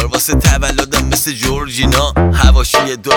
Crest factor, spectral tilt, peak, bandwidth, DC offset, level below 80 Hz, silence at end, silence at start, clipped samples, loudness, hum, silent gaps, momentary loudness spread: 12 dB; -4 dB/octave; 0 dBFS; 19.5 kHz; under 0.1%; -16 dBFS; 0 s; 0 s; under 0.1%; -12 LUFS; none; none; 5 LU